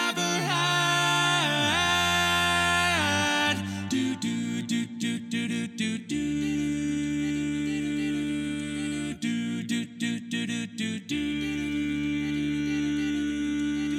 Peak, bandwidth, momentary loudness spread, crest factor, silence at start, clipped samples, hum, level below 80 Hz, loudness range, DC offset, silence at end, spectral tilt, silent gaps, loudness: -10 dBFS; 15.5 kHz; 9 LU; 16 dB; 0 s; under 0.1%; none; -52 dBFS; 7 LU; under 0.1%; 0 s; -3.5 dB/octave; none; -27 LUFS